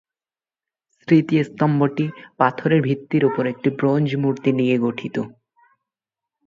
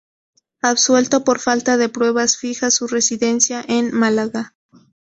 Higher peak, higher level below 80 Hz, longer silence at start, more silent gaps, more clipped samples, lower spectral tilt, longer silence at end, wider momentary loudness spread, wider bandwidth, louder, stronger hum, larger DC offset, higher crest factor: about the same, -2 dBFS vs -2 dBFS; about the same, -64 dBFS vs -60 dBFS; first, 1.1 s vs 0.65 s; neither; neither; first, -9 dB/octave vs -2 dB/octave; first, 1.2 s vs 0.55 s; first, 10 LU vs 6 LU; second, 7.4 kHz vs 8.4 kHz; second, -20 LUFS vs -17 LUFS; neither; neither; about the same, 20 dB vs 16 dB